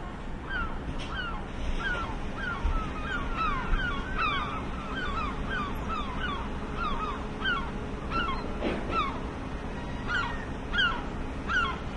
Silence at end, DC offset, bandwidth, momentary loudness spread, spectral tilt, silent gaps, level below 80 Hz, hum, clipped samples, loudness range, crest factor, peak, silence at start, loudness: 0 s; under 0.1%; 12 kHz; 8 LU; -5.5 dB/octave; none; -36 dBFS; none; under 0.1%; 2 LU; 16 dB; -14 dBFS; 0 s; -32 LUFS